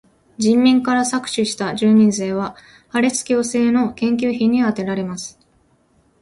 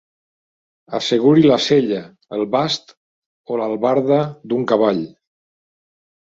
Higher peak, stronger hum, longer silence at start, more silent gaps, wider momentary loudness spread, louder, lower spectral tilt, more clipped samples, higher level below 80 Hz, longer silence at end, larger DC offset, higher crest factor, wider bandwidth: about the same, -4 dBFS vs -2 dBFS; neither; second, 0.4 s vs 0.9 s; second, none vs 2.97-3.44 s; about the same, 11 LU vs 13 LU; about the same, -18 LUFS vs -17 LUFS; second, -4.5 dB/octave vs -6 dB/octave; neither; about the same, -56 dBFS vs -60 dBFS; second, 0.9 s vs 1.25 s; neither; about the same, 14 dB vs 18 dB; first, 11.5 kHz vs 7.8 kHz